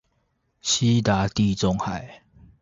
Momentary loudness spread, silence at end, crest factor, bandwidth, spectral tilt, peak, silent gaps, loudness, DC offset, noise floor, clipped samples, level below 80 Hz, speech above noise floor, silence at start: 11 LU; 0.45 s; 18 dB; 7.8 kHz; -4.5 dB/octave; -6 dBFS; none; -23 LUFS; under 0.1%; -70 dBFS; under 0.1%; -46 dBFS; 48 dB; 0.65 s